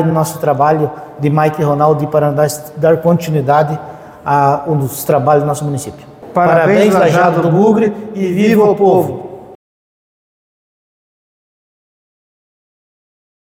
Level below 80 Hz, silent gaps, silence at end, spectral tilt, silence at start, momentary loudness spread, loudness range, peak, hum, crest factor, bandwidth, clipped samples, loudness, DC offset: -52 dBFS; none; 4 s; -7 dB/octave; 0 s; 11 LU; 5 LU; 0 dBFS; none; 14 dB; 17 kHz; under 0.1%; -12 LUFS; under 0.1%